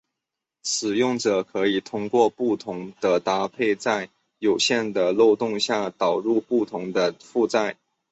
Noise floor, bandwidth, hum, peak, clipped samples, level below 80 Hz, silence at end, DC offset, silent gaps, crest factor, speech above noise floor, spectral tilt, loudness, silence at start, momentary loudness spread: -85 dBFS; 8.2 kHz; none; -6 dBFS; under 0.1%; -66 dBFS; 0.4 s; under 0.1%; none; 18 dB; 63 dB; -3.5 dB/octave; -23 LUFS; 0.65 s; 7 LU